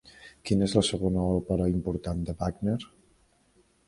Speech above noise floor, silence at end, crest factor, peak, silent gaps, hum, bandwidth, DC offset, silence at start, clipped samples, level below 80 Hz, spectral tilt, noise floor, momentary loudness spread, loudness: 38 dB; 1 s; 22 dB; -8 dBFS; none; none; 11.5 kHz; under 0.1%; 0.05 s; under 0.1%; -44 dBFS; -6.5 dB/octave; -65 dBFS; 9 LU; -28 LUFS